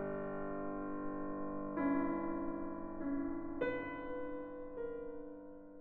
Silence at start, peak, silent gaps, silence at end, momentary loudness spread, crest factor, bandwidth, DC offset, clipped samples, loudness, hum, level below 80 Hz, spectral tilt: 0 s; -26 dBFS; none; 0 s; 10 LU; 14 dB; 4.3 kHz; under 0.1%; under 0.1%; -42 LUFS; 50 Hz at -85 dBFS; -58 dBFS; -6.5 dB/octave